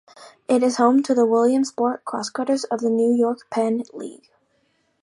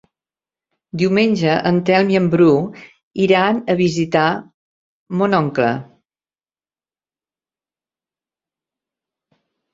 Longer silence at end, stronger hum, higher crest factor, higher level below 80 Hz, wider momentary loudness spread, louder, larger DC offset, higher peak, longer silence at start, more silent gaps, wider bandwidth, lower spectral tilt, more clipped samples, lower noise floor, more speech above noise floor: second, 0.9 s vs 3.9 s; neither; about the same, 18 dB vs 18 dB; second, -76 dBFS vs -58 dBFS; about the same, 11 LU vs 13 LU; second, -20 LUFS vs -16 LUFS; neither; second, -4 dBFS vs 0 dBFS; second, 0.2 s vs 0.95 s; second, none vs 3.03-3.11 s, 4.54-5.06 s; first, 11.5 kHz vs 7.8 kHz; second, -4.5 dB/octave vs -7 dB/octave; neither; second, -66 dBFS vs under -90 dBFS; second, 46 dB vs over 74 dB